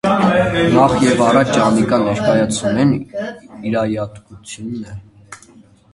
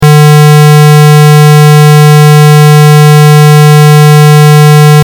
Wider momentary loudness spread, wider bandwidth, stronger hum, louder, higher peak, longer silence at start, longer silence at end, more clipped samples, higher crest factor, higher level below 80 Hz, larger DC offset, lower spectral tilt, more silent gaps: first, 16 LU vs 0 LU; second, 11.5 kHz vs 18.5 kHz; neither; second, -15 LUFS vs -1 LUFS; about the same, 0 dBFS vs 0 dBFS; about the same, 0.05 s vs 0 s; first, 0.55 s vs 0 s; second, under 0.1% vs 10%; first, 16 dB vs 0 dB; about the same, -44 dBFS vs -42 dBFS; neither; about the same, -5.5 dB/octave vs -6.5 dB/octave; neither